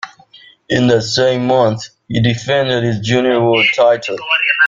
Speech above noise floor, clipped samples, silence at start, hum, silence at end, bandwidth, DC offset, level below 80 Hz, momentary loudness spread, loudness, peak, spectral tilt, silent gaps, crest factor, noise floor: 30 dB; under 0.1%; 0.05 s; none; 0 s; 7.6 kHz; under 0.1%; -48 dBFS; 7 LU; -14 LUFS; 0 dBFS; -5 dB/octave; none; 14 dB; -44 dBFS